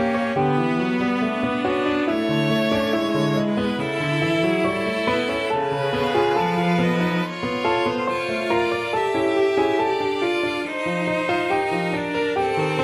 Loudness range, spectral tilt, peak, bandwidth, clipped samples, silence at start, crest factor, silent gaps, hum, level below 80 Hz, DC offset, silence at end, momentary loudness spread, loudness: 1 LU; -6 dB/octave; -8 dBFS; 14.5 kHz; under 0.1%; 0 s; 14 dB; none; none; -52 dBFS; under 0.1%; 0 s; 3 LU; -22 LUFS